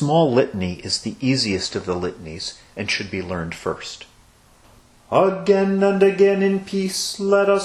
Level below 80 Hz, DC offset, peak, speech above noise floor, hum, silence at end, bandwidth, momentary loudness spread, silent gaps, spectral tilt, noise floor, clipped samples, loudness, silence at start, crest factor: -52 dBFS; under 0.1%; -2 dBFS; 32 dB; none; 0 s; 13 kHz; 13 LU; none; -5 dB/octave; -52 dBFS; under 0.1%; -20 LUFS; 0 s; 18 dB